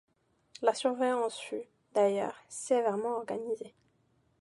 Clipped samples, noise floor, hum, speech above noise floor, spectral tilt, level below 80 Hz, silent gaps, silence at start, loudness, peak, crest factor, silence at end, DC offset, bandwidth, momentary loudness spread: under 0.1%; -71 dBFS; none; 40 dB; -4 dB/octave; -80 dBFS; none; 0.6 s; -32 LUFS; -12 dBFS; 20 dB; 0.75 s; under 0.1%; 11.5 kHz; 11 LU